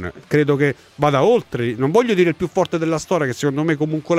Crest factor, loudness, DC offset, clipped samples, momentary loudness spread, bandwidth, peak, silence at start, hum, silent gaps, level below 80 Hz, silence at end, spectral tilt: 14 dB; -18 LUFS; under 0.1%; under 0.1%; 5 LU; 15 kHz; -4 dBFS; 0 s; none; none; -52 dBFS; 0 s; -6.5 dB/octave